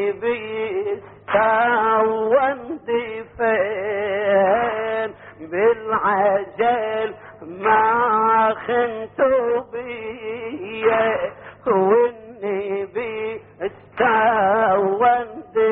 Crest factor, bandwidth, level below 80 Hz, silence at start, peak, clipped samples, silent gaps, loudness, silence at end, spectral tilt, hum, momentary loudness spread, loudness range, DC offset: 14 dB; 4 kHz; -58 dBFS; 0 s; -6 dBFS; under 0.1%; none; -20 LUFS; 0 s; -3 dB/octave; none; 13 LU; 3 LU; under 0.1%